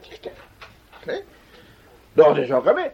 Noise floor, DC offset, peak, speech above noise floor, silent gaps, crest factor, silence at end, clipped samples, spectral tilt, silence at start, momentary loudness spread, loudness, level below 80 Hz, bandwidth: -50 dBFS; under 0.1%; -2 dBFS; 33 dB; none; 20 dB; 0.05 s; under 0.1%; -7 dB/octave; 0.1 s; 23 LU; -19 LUFS; -58 dBFS; 6.8 kHz